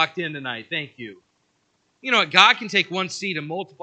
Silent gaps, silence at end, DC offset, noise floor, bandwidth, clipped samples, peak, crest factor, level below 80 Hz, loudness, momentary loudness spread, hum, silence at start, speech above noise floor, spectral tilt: none; 0.15 s; under 0.1%; -68 dBFS; 9.2 kHz; under 0.1%; 0 dBFS; 24 dB; -80 dBFS; -20 LUFS; 20 LU; none; 0 s; 46 dB; -2.5 dB/octave